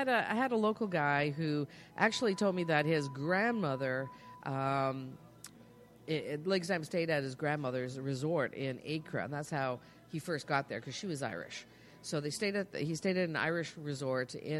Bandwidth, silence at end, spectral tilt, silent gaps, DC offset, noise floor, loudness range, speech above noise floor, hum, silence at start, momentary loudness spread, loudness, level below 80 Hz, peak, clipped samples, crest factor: 13.5 kHz; 0 s; -5.5 dB/octave; none; under 0.1%; -58 dBFS; 6 LU; 23 dB; none; 0 s; 13 LU; -35 LUFS; -74 dBFS; -12 dBFS; under 0.1%; 22 dB